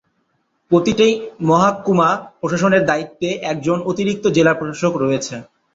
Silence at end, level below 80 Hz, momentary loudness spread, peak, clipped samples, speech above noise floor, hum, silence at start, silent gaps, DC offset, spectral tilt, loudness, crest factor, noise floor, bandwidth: 0.3 s; -54 dBFS; 8 LU; -2 dBFS; under 0.1%; 50 dB; none; 0.7 s; none; under 0.1%; -5.5 dB/octave; -17 LUFS; 16 dB; -66 dBFS; 7.8 kHz